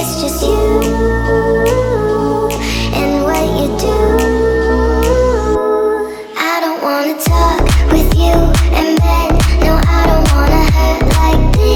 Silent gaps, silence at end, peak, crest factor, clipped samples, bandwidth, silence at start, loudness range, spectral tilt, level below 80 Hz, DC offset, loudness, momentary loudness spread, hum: none; 0 s; 0 dBFS; 10 dB; under 0.1%; 18 kHz; 0 s; 2 LU; -5.5 dB/octave; -14 dBFS; under 0.1%; -13 LUFS; 4 LU; none